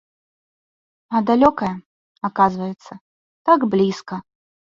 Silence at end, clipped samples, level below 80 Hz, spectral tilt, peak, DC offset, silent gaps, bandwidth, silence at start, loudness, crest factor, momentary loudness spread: 0.45 s; under 0.1%; -56 dBFS; -7 dB/octave; -2 dBFS; under 0.1%; 1.86-2.15 s, 3.01-3.45 s; 7.6 kHz; 1.1 s; -19 LUFS; 20 dB; 17 LU